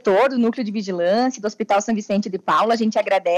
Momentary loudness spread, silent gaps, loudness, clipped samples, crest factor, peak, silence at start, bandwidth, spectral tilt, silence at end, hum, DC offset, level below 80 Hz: 6 LU; none; -20 LUFS; under 0.1%; 12 dB; -6 dBFS; 0.05 s; 10.5 kHz; -5 dB/octave; 0 s; none; under 0.1%; -68 dBFS